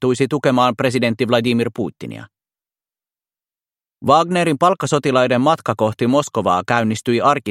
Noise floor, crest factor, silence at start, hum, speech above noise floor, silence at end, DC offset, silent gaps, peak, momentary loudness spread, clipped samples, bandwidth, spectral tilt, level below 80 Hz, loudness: under -90 dBFS; 18 dB; 0 s; none; over 73 dB; 0 s; under 0.1%; none; 0 dBFS; 9 LU; under 0.1%; 15 kHz; -5.5 dB/octave; -60 dBFS; -17 LUFS